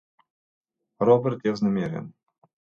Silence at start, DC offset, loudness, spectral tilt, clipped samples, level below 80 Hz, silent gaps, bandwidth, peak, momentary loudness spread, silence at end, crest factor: 1 s; under 0.1%; -24 LUFS; -8.5 dB/octave; under 0.1%; -64 dBFS; none; 7 kHz; -6 dBFS; 15 LU; 0.7 s; 20 dB